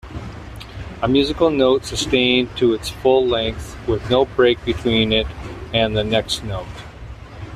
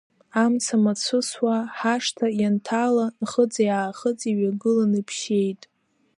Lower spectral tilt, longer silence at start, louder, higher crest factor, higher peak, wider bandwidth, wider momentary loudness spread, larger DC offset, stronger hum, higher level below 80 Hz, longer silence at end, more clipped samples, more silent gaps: about the same, -5 dB/octave vs -4.5 dB/octave; second, 0.05 s vs 0.35 s; first, -18 LUFS vs -23 LUFS; about the same, 16 dB vs 16 dB; first, -2 dBFS vs -8 dBFS; first, 14 kHz vs 11.5 kHz; first, 19 LU vs 4 LU; neither; neither; first, -36 dBFS vs -72 dBFS; second, 0 s vs 0.65 s; neither; neither